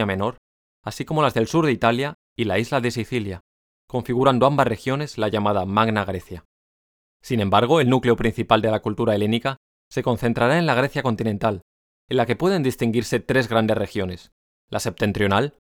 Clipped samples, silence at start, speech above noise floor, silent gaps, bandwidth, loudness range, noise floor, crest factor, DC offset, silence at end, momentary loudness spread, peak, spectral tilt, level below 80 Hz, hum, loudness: under 0.1%; 0 s; over 69 dB; 0.38-0.83 s, 2.14-2.36 s, 3.40-3.88 s, 6.45-7.20 s, 9.57-9.91 s, 11.62-12.08 s, 14.32-14.68 s; 19 kHz; 2 LU; under -90 dBFS; 20 dB; under 0.1%; 0.2 s; 12 LU; 0 dBFS; -6 dB/octave; -48 dBFS; none; -21 LUFS